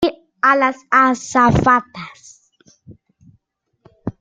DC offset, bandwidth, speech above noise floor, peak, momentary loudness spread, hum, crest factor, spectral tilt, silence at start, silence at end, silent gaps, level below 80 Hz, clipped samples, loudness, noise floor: under 0.1%; 9.4 kHz; 50 dB; 0 dBFS; 20 LU; none; 18 dB; -5.5 dB/octave; 0 s; 0.1 s; none; -42 dBFS; under 0.1%; -15 LUFS; -66 dBFS